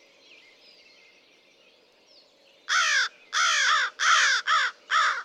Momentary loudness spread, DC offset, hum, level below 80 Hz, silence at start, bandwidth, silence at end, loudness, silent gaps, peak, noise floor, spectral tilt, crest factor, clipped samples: 5 LU; under 0.1%; none; under -90 dBFS; 2.7 s; 13 kHz; 0 s; -22 LUFS; none; -8 dBFS; -59 dBFS; 5 dB/octave; 20 dB; under 0.1%